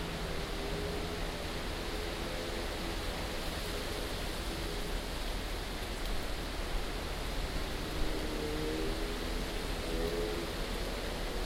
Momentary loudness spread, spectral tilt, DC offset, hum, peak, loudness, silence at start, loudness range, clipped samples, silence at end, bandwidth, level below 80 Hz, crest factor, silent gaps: 3 LU; -4 dB/octave; under 0.1%; none; -20 dBFS; -38 LUFS; 0 s; 2 LU; under 0.1%; 0 s; 16 kHz; -40 dBFS; 16 dB; none